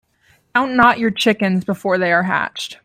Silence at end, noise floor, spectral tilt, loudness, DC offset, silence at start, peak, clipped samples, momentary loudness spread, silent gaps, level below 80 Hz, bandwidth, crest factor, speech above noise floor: 0.1 s; -57 dBFS; -5 dB/octave; -16 LUFS; under 0.1%; 0.55 s; 0 dBFS; under 0.1%; 7 LU; none; -54 dBFS; 15 kHz; 16 dB; 41 dB